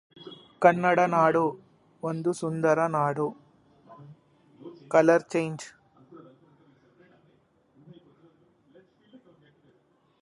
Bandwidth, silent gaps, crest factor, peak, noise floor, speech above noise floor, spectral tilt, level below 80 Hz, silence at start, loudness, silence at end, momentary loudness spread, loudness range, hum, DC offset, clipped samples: 11.5 kHz; none; 24 dB; -4 dBFS; -66 dBFS; 42 dB; -6.5 dB/octave; -72 dBFS; 0.2 s; -25 LUFS; 4.05 s; 26 LU; 5 LU; none; under 0.1%; under 0.1%